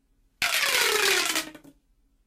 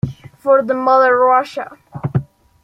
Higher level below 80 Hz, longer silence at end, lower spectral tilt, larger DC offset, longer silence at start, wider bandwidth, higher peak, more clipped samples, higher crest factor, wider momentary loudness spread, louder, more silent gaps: second, -62 dBFS vs -50 dBFS; first, 0.7 s vs 0.4 s; second, 1 dB/octave vs -8 dB/octave; neither; first, 0.4 s vs 0.05 s; first, 16 kHz vs 7.8 kHz; second, -12 dBFS vs -2 dBFS; neither; about the same, 16 dB vs 14 dB; second, 9 LU vs 16 LU; second, -23 LUFS vs -15 LUFS; neither